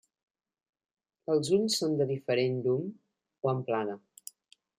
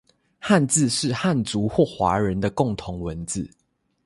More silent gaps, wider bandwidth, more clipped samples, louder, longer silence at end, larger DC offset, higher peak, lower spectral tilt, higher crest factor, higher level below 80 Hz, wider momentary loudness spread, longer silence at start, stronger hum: neither; first, 16 kHz vs 11.5 kHz; neither; second, -30 LUFS vs -22 LUFS; first, 0.85 s vs 0.6 s; neither; second, -14 dBFS vs -4 dBFS; about the same, -5 dB/octave vs -5 dB/octave; about the same, 18 dB vs 18 dB; second, -76 dBFS vs -46 dBFS; first, 17 LU vs 12 LU; first, 1.3 s vs 0.4 s; neither